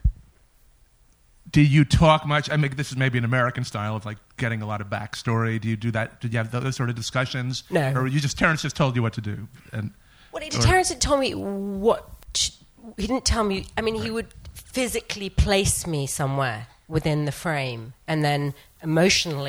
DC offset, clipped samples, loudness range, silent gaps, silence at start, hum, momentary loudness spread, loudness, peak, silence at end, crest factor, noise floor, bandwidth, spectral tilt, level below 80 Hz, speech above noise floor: under 0.1%; under 0.1%; 5 LU; none; 0.05 s; none; 13 LU; -24 LUFS; -4 dBFS; 0 s; 20 dB; -58 dBFS; 19.5 kHz; -4.5 dB/octave; -38 dBFS; 34 dB